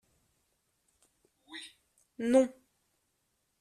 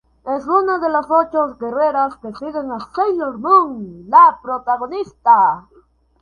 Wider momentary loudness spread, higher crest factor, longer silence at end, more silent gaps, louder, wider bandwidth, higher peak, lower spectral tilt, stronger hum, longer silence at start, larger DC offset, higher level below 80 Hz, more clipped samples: first, 21 LU vs 14 LU; first, 24 dB vs 16 dB; first, 1.1 s vs 0.6 s; neither; second, -29 LUFS vs -16 LUFS; first, 12.5 kHz vs 6.8 kHz; second, -14 dBFS vs 0 dBFS; second, -4.5 dB/octave vs -7 dB/octave; neither; first, 1.5 s vs 0.25 s; neither; second, -74 dBFS vs -56 dBFS; neither